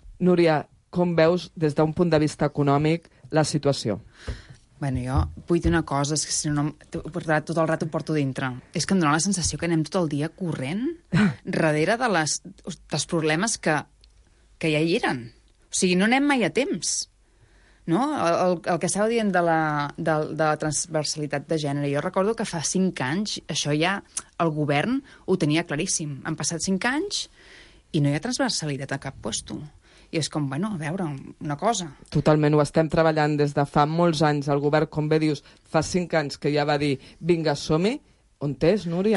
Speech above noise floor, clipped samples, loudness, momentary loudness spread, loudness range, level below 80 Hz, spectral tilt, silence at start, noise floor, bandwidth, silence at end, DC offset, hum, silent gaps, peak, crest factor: 33 dB; under 0.1%; -24 LUFS; 9 LU; 4 LU; -46 dBFS; -5 dB/octave; 0.05 s; -57 dBFS; 11.5 kHz; 0 s; under 0.1%; none; none; -6 dBFS; 18 dB